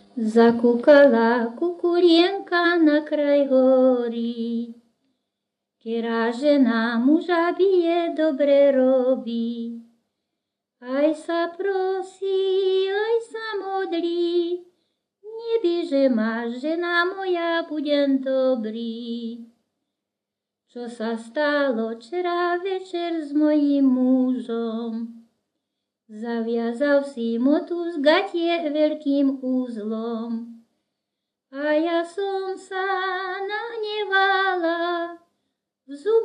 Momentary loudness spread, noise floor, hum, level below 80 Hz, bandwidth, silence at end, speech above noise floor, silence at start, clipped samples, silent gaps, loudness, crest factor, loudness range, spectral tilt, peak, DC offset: 13 LU; -85 dBFS; none; -82 dBFS; 10 kHz; 0 s; 64 dB; 0.15 s; under 0.1%; none; -22 LUFS; 20 dB; 7 LU; -5.5 dB/octave; -2 dBFS; under 0.1%